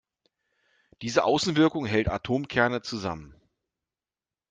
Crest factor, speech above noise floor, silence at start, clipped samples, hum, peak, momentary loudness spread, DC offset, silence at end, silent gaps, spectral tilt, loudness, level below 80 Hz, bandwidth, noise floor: 22 dB; over 64 dB; 1 s; under 0.1%; none; -6 dBFS; 11 LU; under 0.1%; 1.2 s; none; -5 dB/octave; -26 LUFS; -50 dBFS; 9.4 kHz; under -90 dBFS